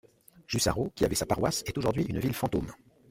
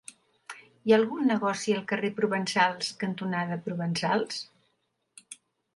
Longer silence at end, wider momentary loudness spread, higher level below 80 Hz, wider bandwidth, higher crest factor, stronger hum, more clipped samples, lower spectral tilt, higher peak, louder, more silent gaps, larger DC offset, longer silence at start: about the same, 0.35 s vs 0.4 s; second, 5 LU vs 22 LU; first, -48 dBFS vs -76 dBFS; first, 16.5 kHz vs 11.5 kHz; about the same, 20 dB vs 20 dB; neither; neither; about the same, -4.5 dB/octave vs -5 dB/octave; about the same, -10 dBFS vs -8 dBFS; about the same, -30 LUFS vs -28 LUFS; neither; neither; about the same, 0.4 s vs 0.5 s